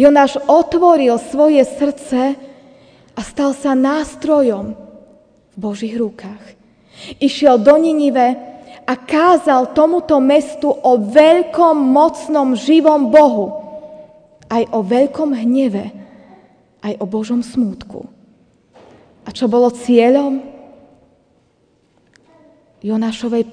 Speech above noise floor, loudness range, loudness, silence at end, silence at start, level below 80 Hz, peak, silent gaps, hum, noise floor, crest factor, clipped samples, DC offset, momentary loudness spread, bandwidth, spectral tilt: 44 dB; 9 LU; -14 LUFS; 0 s; 0 s; -52 dBFS; 0 dBFS; none; none; -57 dBFS; 14 dB; 0.2%; under 0.1%; 18 LU; 10 kHz; -5.5 dB/octave